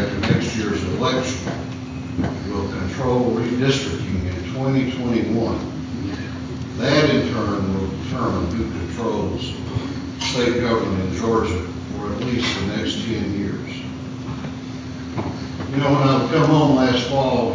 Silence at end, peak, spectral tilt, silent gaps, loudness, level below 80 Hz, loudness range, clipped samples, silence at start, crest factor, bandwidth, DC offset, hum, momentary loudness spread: 0 s; -2 dBFS; -6 dB/octave; none; -22 LUFS; -38 dBFS; 4 LU; under 0.1%; 0 s; 18 dB; 7.6 kHz; under 0.1%; none; 12 LU